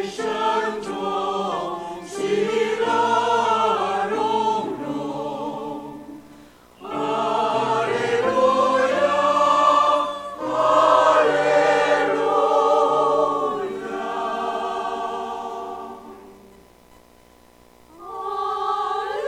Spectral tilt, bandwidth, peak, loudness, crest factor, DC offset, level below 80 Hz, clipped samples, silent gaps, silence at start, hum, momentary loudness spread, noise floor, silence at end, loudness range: -4 dB/octave; 13.5 kHz; -2 dBFS; -21 LUFS; 18 dB; under 0.1%; -60 dBFS; under 0.1%; none; 0 s; 60 Hz at -60 dBFS; 15 LU; -52 dBFS; 0 s; 12 LU